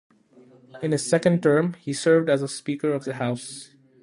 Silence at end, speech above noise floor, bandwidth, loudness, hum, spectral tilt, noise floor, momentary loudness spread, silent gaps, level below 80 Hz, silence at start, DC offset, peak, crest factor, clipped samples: 0.35 s; 31 dB; 11.5 kHz; -23 LUFS; none; -5.5 dB/octave; -53 dBFS; 12 LU; none; -68 dBFS; 0.75 s; under 0.1%; -6 dBFS; 18 dB; under 0.1%